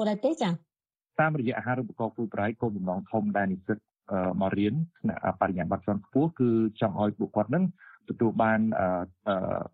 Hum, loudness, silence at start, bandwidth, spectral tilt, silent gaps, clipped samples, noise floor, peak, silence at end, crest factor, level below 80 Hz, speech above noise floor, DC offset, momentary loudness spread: none; -29 LUFS; 0 s; 7.8 kHz; -8.5 dB/octave; none; under 0.1%; -74 dBFS; -10 dBFS; 0.05 s; 18 dB; -62 dBFS; 46 dB; under 0.1%; 7 LU